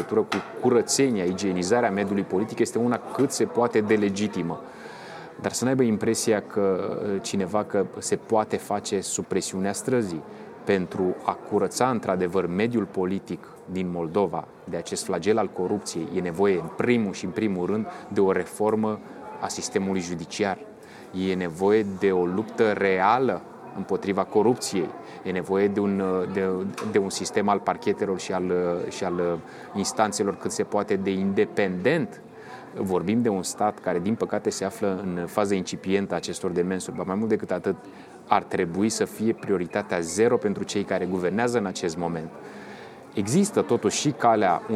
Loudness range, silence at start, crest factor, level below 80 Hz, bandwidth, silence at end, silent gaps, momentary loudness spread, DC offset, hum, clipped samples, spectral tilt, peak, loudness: 3 LU; 0 s; 22 dB; -64 dBFS; 15 kHz; 0 s; none; 11 LU; under 0.1%; none; under 0.1%; -5 dB/octave; -4 dBFS; -25 LUFS